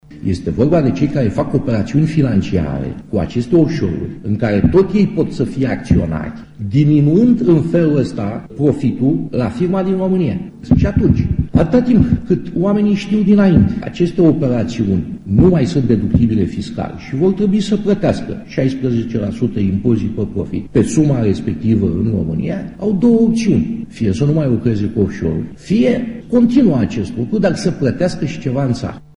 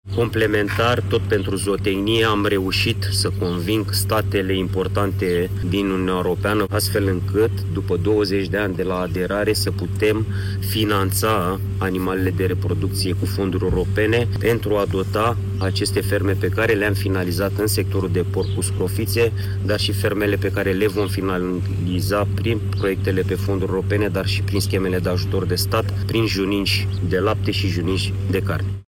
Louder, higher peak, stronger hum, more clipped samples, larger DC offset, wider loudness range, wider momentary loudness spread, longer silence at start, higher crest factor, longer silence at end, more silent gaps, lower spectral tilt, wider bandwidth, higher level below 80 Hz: first, -15 LUFS vs -20 LUFS; first, 0 dBFS vs -8 dBFS; neither; neither; neither; about the same, 3 LU vs 1 LU; first, 9 LU vs 4 LU; about the same, 0.1 s vs 0.05 s; about the same, 14 dB vs 12 dB; first, 0.2 s vs 0.05 s; neither; first, -8.5 dB/octave vs -5.5 dB/octave; second, 11 kHz vs 17 kHz; first, -32 dBFS vs -38 dBFS